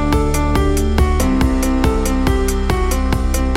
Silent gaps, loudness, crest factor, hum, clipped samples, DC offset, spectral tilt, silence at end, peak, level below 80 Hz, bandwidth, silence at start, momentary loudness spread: none; -17 LUFS; 12 dB; none; under 0.1%; under 0.1%; -6 dB/octave; 0 s; -2 dBFS; -18 dBFS; 16 kHz; 0 s; 2 LU